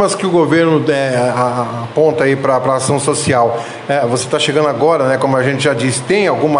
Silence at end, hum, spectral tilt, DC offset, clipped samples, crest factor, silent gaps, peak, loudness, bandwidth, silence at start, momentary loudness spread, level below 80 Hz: 0 s; none; -5 dB/octave; under 0.1%; under 0.1%; 12 dB; none; 0 dBFS; -14 LUFS; 11.5 kHz; 0 s; 4 LU; -50 dBFS